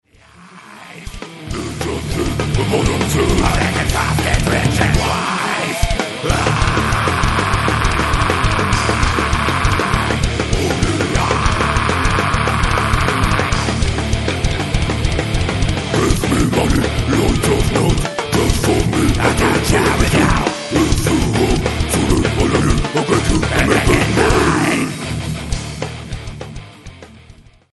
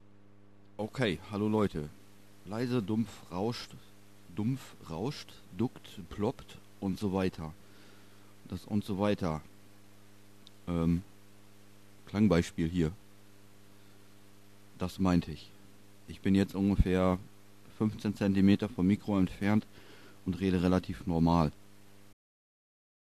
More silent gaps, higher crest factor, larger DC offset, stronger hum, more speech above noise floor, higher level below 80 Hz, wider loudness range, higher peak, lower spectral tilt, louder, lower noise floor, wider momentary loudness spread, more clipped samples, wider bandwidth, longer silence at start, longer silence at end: neither; second, 16 dB vs 22 dB; first, 0.5% vs 0.2%; neither; about the same, 29 dB vs 30 dB; first, -22 dBFS vs -48 dBFS; second, 3 LU vs 8 LU; first, 0 dBFS vs -12 dBFS; second, -5 dB/octave vs -7.5 dB/octave; first, -16 LUFS vs -32 LUFS; second, -43 dBFS vs -61 dBFS; second, 9 LU vs 17 LU; neither; second, 12 kHz vs 14 kHz; second, 0.4 s vs 0.8 s; second, 0.4 s vs 1.6 s